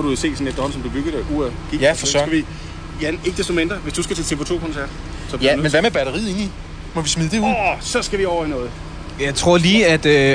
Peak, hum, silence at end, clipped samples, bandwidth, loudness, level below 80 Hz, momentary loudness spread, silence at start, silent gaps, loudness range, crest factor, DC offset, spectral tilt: -2 dBFS; none; 0 s; under 0.1%; 10 kHz; -19 LUFS; -32 dBFS; 15 LU; 0 s; none; 4 LU; 16 dB; under 0.1%; -4 dB/octave